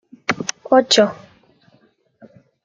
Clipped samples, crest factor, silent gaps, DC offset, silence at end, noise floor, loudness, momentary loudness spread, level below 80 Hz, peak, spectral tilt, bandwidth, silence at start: under 0.1%; 18 dB; none; under 0.1%; 1.5 s; -58 dBFS; -17 LUFS; 11 LU; -66 dBFS; -2 dBFS; -3 dB/octave; 9.6 kHz; 0.3 s